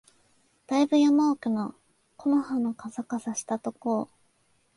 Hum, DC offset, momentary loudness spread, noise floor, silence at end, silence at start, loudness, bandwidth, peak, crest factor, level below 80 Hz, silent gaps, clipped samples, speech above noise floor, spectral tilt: none; under 0.1%; 12 LU; -68 dBFS; 0.7 s; 0.7 s; -27 LUFS; 11.5 kHz; -12 dBFS; 16 dB; -74 dBFS; none; under 0.1%; 42 dB; -5 dB/octave